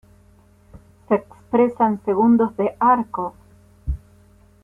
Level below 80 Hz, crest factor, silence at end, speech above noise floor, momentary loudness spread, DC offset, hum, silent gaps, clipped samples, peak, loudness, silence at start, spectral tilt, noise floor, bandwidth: -40 dBFS; 16 dB; 0.65 s; 34 dB; 15 LU; under 0.1%; none; none; under 0.1%; -6 dBFS; -20 LUFS; 0.75 s; -9.5 dB/octave; -53 dBFS; 3.4 kHz